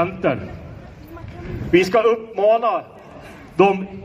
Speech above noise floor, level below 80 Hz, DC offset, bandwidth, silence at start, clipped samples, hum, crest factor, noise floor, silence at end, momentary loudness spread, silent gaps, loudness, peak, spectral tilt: 21 dB; -44 dBFS; under 0.1%; 15 kHz; 0 s; under 0.1%; none; 18 dB; -39 dBFS; 0 s; 23 LU; none; -18 LUFS; -2 dBFS; -6.5 dB/octave